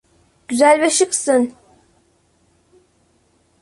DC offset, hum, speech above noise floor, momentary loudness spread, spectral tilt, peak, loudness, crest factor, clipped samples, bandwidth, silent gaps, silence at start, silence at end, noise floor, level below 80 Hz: under 0.1%; none; 45 dB; 11 LU; -1.5 dB/octave; -2 dBFS; -16 LUFS; 18 dB; under 0.1%; 11.5 kHz; none; 0.5 s; 2.1 s; -60 dBFS; -64 dBFS